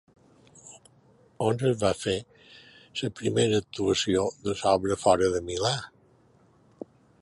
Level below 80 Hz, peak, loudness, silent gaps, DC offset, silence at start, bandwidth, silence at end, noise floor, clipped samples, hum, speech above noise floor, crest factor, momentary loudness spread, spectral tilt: -54 dBFS; -6 dBFS; -27 LUFS; none; under 0.1%; 0.65 s; 11.5 kHz; 1.35 s; -61 dBFS; under 0.1%; none; 35 dB; 22 dB; 22 LU; -4.5 dB/octave